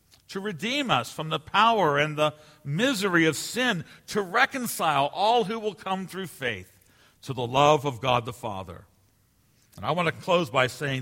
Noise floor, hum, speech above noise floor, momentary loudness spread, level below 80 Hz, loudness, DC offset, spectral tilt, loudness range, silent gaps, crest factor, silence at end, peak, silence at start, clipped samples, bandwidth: -64 dBFS; none; 39 dB; 14 LU; -62 dBFS; -25 LUFS; under 0.1%; -4.5 dB/octave; 4 LU; none; 22 dB; 0 s; -6 dBFS; 0.3 s; under 0.1%; 16.5 kHz